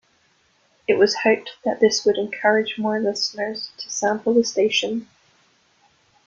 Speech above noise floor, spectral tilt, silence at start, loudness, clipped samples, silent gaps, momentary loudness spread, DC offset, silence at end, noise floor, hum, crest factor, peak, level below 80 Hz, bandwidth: 41 dB; -3 dB/octave; 0.9 s; -21 LUFS; under 0.1%; none; 10 LU; under 0.1%; 1.2 s; -62 dBFS; none; 20 dB; -2 dBFS; -66 dBFS; 7.6 kHz